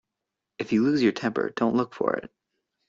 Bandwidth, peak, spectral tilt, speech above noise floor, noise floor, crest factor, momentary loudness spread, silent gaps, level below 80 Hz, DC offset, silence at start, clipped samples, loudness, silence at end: 7.6 kHz; -8 dBFS; -6.5 dB/octave; 61 dB; -85 dBFS; 18 dB; 7 LU; none; -66 dBFS; under 0.1%; 0.6 s; under 0.1%; -25 LUFS; 0.6 s